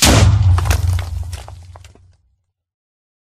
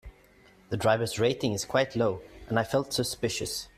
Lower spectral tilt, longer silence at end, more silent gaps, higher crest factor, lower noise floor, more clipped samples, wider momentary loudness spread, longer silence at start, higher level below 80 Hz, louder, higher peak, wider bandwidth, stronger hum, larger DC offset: about the same, -4 dB/octave vs -4.5 dB/octave; first, 1.5 s vs 0.1 s; neither; about the same, 16 dB vs 18 dB; first, -64 dBFS vs -58 dBFS; neither; first, 20 LU vs 5 LU; about the same, 0 s vs 0.05 s; first, -24 dBFS vs -56 dBFS; first, -15 LUFS vs -28 LUFS; first, 0 dBFS vs -10 dBFS; about the same, 16 kHz vs 15.5 kHz; neither; neither